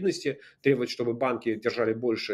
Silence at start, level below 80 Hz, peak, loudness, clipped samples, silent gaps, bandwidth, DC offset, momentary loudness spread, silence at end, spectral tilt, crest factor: 0 s; -72 dBFS; -8 dBFS; -28 LUFS; under 0.1%; none; 13 kHz; under 0.1%; 4 LU; 0 s; -5.5 dB/octave; 18 dB